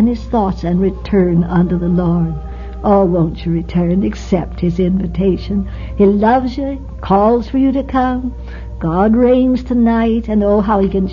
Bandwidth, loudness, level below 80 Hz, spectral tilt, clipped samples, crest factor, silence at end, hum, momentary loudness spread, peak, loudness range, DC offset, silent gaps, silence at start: 7 kHz; -15 LUFS; -26 dBFS; -9.5 dB/octave; under 0.1%; 12 dB; 0 s; none; 9 LU; -2 dBFS; 2 LU; under 0.1%; none; 0 s